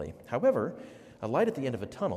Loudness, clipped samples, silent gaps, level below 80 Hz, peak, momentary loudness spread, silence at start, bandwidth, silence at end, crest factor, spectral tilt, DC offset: -31 LUFS; under 0.1%; none; -64 dBFS; -14 dBFS; 15 LU; 0 s; 14 kHz; 0 s; 16 dB; -7.5 dB/octave; under 0.1%